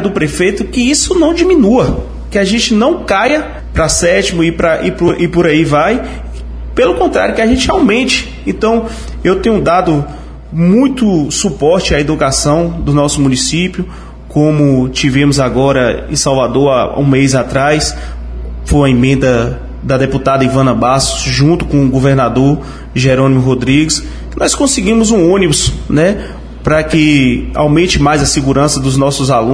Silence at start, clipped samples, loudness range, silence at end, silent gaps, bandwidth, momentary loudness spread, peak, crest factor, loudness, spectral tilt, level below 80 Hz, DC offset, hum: 0 s; under 0.1%; 2 LU; 0 s; none; 11 kHz; 8 LU; 0 dBFS; 10 dB; -11 LUFS; -5 dB/octave; -26 dBFS; under 0.1%; none